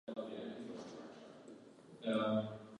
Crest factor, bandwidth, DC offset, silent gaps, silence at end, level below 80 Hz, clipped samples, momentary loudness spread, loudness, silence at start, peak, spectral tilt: 18 dB; 10 kHz; under 0.1%; none; 0 s; -82 dBFS; under 0.1%; 21 LU; -41 LUFS; 0.05 s; -24 dBFS; -6.5 dB/octave